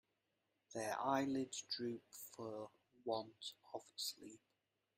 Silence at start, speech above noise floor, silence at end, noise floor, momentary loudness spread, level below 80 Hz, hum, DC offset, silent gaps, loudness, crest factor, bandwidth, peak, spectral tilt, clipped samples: 0.7 s; 41 dB; 0.6 s; -87 dBFS; 15 LU; -88 dBFS; none; under 0.1%; none; -45 LUFS; 22 dB; 15.5 kHz; -24 dBFS; -3.5 dB/octave; under 0.1%